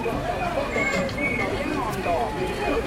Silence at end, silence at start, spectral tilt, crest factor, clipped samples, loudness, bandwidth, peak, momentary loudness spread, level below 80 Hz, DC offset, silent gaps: 0 s; 0 s; -5 dB/octave; 12 dB; under 0.1%; -25 LUFS; 16.5 kHz; -12 dBFS; 3 LU; -38 dBFS; under 0.1%; none